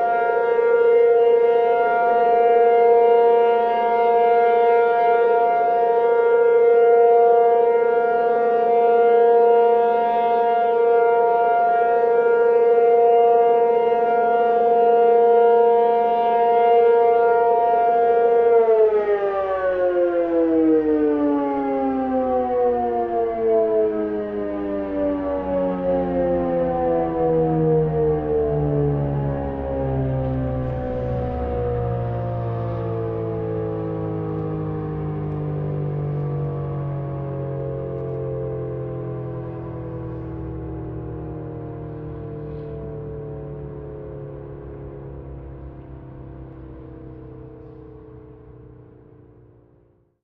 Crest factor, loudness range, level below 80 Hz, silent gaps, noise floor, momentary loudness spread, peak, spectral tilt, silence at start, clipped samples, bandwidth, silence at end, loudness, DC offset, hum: 12 dB; 16 LU; -42 dBFS; none; -58 dBFS; 18 LU; -6 dBFS; -10.5 dB/octave; 0 s; under 0.1%; 4.2 kHz; 1.55 s; -19 LUFS; under 0.1%; none